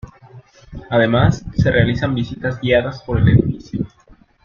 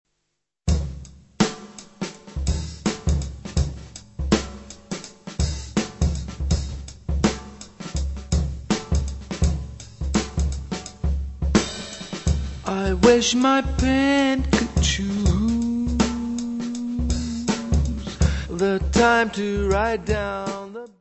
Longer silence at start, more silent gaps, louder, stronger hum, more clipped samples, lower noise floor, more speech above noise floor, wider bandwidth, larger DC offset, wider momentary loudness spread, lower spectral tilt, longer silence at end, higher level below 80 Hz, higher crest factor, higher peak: second, 0.05 s vs 0.65 s; neither; first, -17 LUFS vs -23 LUFS; neither; neither; second, -49 dBFS vs -77 dBFS; second, 33 dB vs 58 dB; second, 7.2 kHz vs 8.4 kHz; neither; about the same, 13 LU vs 15 LU; first, -7.5 dB/octave vs -5 dB/octave; first, 0.6 s vs 0.15 s; second, -34 dBFS vs -28 dBFS; second, 16 dB vs 22 dB; about the same, -2 dBFS vs -2 dBFS